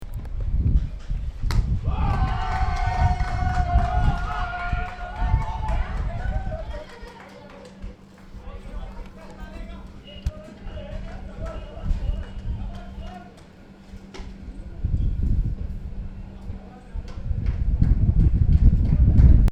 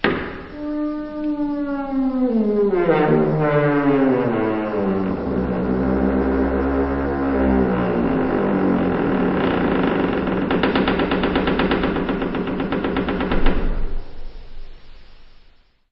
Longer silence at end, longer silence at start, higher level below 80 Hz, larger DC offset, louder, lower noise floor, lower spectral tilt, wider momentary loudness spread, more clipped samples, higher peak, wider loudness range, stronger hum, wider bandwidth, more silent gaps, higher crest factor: second, 0 s vs 0.65 s; about the same, 0 s vs 0 s; first, -24 dBFS vs -30 dBFS; neither; second, -25 LUFS vs -20 LUFS; second, -46 dBFS vs -51 dBFS; first, -8 dB/octave vs -6 dB/octave; first, 21 LU vs 7 LU; neither; about the same, -2 dBFS vs -2 dBFS; first, 14 LU vs 5 LU; neither; first, 8 kHz vs 5.8 kHz; neither; about the same, 20 dB vs 18 dB